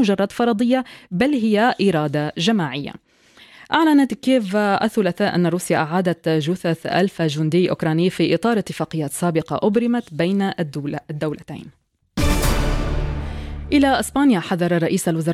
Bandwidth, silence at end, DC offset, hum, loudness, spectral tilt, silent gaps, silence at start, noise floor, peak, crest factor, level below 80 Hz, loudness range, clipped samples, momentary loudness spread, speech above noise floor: 16.5 kHz; 0 s; under 0.1%; none; -20 LUFS; -6 dB/octave; none; 0 s; -49 dBFS; -4 dBFS; 16 dB; -32 dBFS; 4 LU; under 0.1%; 9 LU; 30 dB